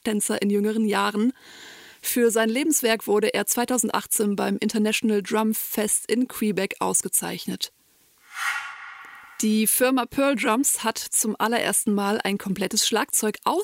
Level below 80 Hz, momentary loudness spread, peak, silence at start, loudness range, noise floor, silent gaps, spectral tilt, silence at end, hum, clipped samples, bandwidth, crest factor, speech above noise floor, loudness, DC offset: -66 dBFS; 10 LU; -8 dBFS; 0.05 s; 3 LU; -60 dBFS; none; -3 dB/octave; 0 s; none; under 0.1%; 16 kHz; 16 dB; 37 dB; -23 LUFS; under 0.1%